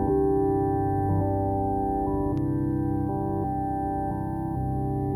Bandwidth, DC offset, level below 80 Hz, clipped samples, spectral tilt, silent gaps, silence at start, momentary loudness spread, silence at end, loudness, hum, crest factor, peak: 12.5 kHz; under 0.1%; -38 dBFS; under 0.1%; -11.5 dB/octave; none; 0 s; 5 LU; 0 s; -27 LUFS; 50 Hz at -50 dBFS; 12 dB; -14 dBFS